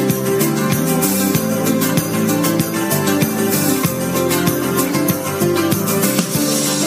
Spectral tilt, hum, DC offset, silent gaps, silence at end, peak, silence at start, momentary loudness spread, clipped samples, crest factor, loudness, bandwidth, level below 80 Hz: -4.5 dB/octave; none; under 0.1%; none; 0 s; 0 dBFS; 0 s; 2 LU; under 0.1%; 16 dB; -16 LUFS; 16 kHz; -52 dBFS